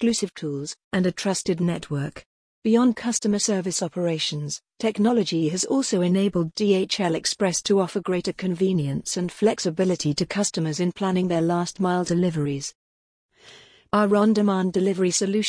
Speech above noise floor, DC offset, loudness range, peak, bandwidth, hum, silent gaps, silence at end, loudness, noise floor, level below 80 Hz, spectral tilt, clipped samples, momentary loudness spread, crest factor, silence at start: 27 dB; under 0.1%; 2 LU; -8 dBFS; 10.5 kHz; none; 0.84-0.91 s, 2.26-2.62 s, 12.75-13.29 s; 0 s; -23 LUFS; -50 dBFS; -60 dBFS; -5 dB/octave; under 0.1%; 7 LU; 14 dB; 0 s